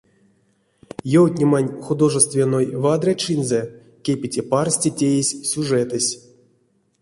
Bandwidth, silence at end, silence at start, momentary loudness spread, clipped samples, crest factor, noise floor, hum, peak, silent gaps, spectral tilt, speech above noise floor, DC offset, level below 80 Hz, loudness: 11.5 kHz; 0.85 s; 1.05 s; 9 LU; under 0.1%; 18 dB; -63 dBFS; none; -2 dBFS; none; -5 dB/octave; 44 dB; under 0.1%; -60 dBFS; -19 LUFS